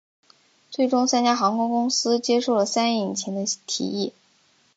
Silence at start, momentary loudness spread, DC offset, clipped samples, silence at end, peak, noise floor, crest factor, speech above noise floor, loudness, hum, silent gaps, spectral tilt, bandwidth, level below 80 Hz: 0.7 s; 7 LU; under 0.1%; under 0.1%; 0.65 s; -6 dBFS; -62 dBFS; 18 dB; 39 dB; -22 LUFS; none; none; -3.5 dB/octave; 9 kHz; -74 dBFS